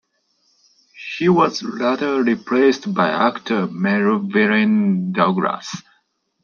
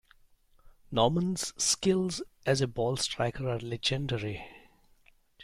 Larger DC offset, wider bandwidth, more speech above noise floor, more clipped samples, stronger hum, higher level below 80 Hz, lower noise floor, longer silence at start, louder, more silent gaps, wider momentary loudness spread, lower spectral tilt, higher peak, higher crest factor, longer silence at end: neither; second, 7.2 kHz vs 16 kHz; first, 48 dB vs 33 dB; neither; neither; second, -66 dBFS vs -54 dBFS; about the same, -65 dBFS vs -63 dBFS; first, 0.95 s vs 0.65 s; first, -18 LUFS vs -30 LUFS; neither; about the same, 7 LU vs 8 LU; first, -6.5 dB/octave vs -4 dB/octave; first, -4 dBFS vs -12 dBFS; about the same, 16 dB vs 20 dB; first, 0.65 s vs 0 s